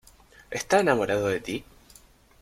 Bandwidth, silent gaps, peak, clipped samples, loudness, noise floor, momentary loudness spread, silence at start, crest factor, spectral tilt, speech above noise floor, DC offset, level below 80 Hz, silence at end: 16.5 kHz; none; -8 dBFS; under 0.1%; -26 LUFS; -55 dBFS; 14 LU; 0.5 s; 20 dB; -4.5 dB/octave; 30 dB; under 0.1%; -56 dBFS; 0.8 s